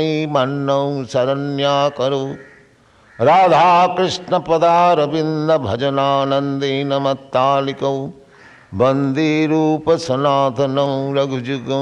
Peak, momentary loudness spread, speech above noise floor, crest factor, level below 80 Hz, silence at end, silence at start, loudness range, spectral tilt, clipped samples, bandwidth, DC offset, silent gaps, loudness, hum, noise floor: -2 dBFS; 8 LU; 34 dB; 14 dB; -58 dBFS; 0 s; 0 s; 4 LU; -6 dB/octave; under 0.1%; 10 kHz; under 0.1%; none; -16 LUFS; none; -50 dBFS